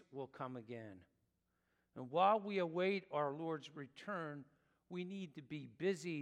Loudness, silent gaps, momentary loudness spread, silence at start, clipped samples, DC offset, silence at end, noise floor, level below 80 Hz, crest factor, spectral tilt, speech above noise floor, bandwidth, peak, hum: -41 LUFS; none; 18 LU; 0.1 s; under 0.1%; under 0.1%; 0 s; -84 dBFS; -88 dBFS; 22 dB; -6 dB/octave; 42 dB; 11 kHz; -20 dBFS; none